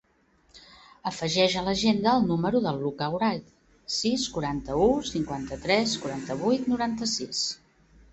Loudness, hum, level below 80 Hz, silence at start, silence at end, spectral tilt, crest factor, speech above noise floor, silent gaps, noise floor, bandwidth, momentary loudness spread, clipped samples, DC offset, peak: -26 LUFS; none; -52 dBFS; 0.55 s; 0.55 s; -4.5 dB/octave; 20 dB; 38 dB; none; -64 dBFS; 8.4 kHz; 9 LU; under 0.1%; under 0.1%; -8 dBFS